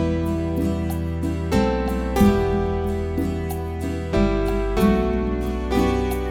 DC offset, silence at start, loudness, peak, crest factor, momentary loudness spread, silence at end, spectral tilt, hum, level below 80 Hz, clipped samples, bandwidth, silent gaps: under 0.1%; 0 s; -22 LUFS; -4 dBFS; 18 dB; 7 LU; 0 s; -7.5 dB/octave; none; -28 dBFS; under 0.1%; 18.5 kHz; none